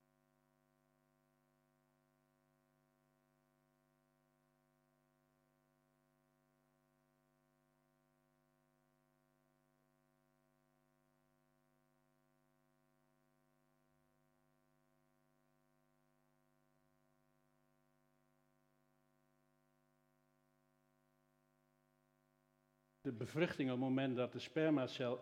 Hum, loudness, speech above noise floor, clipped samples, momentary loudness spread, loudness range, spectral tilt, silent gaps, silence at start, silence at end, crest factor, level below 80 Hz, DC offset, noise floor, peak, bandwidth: 50 Hz at -85 dBFS; -41 LUFS; 40 dB; under 0.1%; 9 LU; 14 LU; -7 dB/octave; none; 23.05 s; 0 s; 28 dB; under -90 dBFS; under 0.1%; -80 dBFS; -22 dBFS; 11 kHz